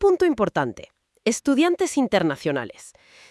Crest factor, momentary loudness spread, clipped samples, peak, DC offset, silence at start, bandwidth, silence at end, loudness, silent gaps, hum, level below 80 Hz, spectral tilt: 16 dB; 10 LU; under 0.1%; -6 dBFS; under 0.1%; 0 s; 12 kHz; 0.4 s; -22 LUFS; none; none; -54 dBFS; -4.5 dB/octave